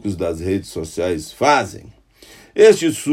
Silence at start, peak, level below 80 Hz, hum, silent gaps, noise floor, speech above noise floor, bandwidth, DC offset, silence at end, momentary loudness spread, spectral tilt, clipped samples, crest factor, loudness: 0.05 s; 0 dBFS; -50 dBFS; none; none; -46 dBFS; 29 dB; 15.5 kHz; under 0.1%; 0 s; 15 LU; -4.5 dB/octave; under 0.1%; 18 dB; -17 LUFS